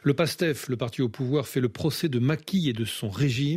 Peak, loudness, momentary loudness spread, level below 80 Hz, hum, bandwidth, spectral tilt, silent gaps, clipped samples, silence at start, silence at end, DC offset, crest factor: -10 dBFS; -27 LUFS; 5 LU; -60 dBFS; none; 16 kHz; -6 dB/octave; none; under 0.1%; 0.05 s; 0 s; under 0.1%; 16 dB